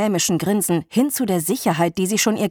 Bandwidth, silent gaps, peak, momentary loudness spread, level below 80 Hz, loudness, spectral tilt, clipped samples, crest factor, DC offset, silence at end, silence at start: 19 kHz; none; -6 dBFS; 2 LU; -58 dBFS; -19 LUFS; -4.5 dB/octave; under 0.1%; 14 dB; under 0.1%; 0 s; 0 s